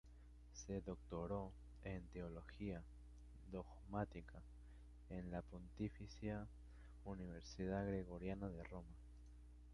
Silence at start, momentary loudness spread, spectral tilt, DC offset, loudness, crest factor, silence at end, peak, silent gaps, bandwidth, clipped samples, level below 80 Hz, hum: 0.05 s; 16 LU; -7 dB/octave; under 0.1%; -51 LUFS; 22 dB; 0 s; -30 dBFS; none; 11 kHz; under 0.1%; -60 dBFS; 60 Hz at -60 dBFS